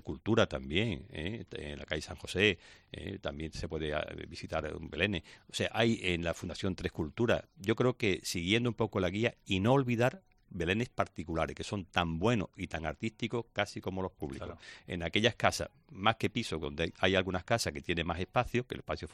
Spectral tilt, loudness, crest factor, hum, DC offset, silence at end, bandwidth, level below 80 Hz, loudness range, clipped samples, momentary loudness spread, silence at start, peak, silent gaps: -5 dB/octave; -33 LUFS; 26 dB; none; under 0.1%; 0 s; 14.5 kHz; -54 dBFS; 4 LU; under 0.1%; 11 LU; 0.05 s; -8 dBFS; none